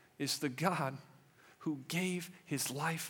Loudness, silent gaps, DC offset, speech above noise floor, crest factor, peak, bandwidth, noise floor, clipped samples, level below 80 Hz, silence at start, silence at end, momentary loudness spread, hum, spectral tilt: -37 LUFS; none; under 0.1%; 26 dB; 24 dB; -16 dBFS; 18.5 kHz; -63 dBFS; under 0.1%; -84 dBFS; 0.2 s; 0 s; 8 LU; none; -4 dB/octave